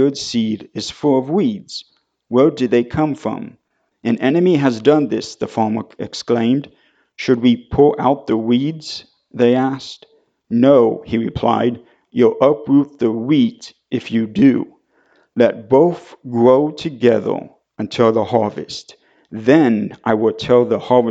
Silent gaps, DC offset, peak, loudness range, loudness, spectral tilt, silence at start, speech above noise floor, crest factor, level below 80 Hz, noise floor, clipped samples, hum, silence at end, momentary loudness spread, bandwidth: none; under 0.1%; 0 dBFS; 2 LU; -16 LUFS; -6.5 dB/octave; 0 s; 42 dB; 16 dB; -50 dBFS; -57 dBFS; under 0.1%; none; 0 s; 15 LU; 8 kHz